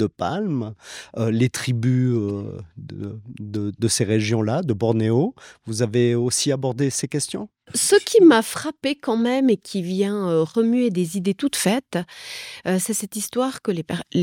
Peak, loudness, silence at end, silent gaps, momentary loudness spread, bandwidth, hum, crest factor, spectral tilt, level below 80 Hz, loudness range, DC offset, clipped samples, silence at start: -4 dBFS; -21 LUFS; 0 s; none; 14 LU; 17.5 kHz; none; 18 dB; -5 dB/octave; -64 dBFS; 5 LU; under 0.1%; under 0.1%; 0 s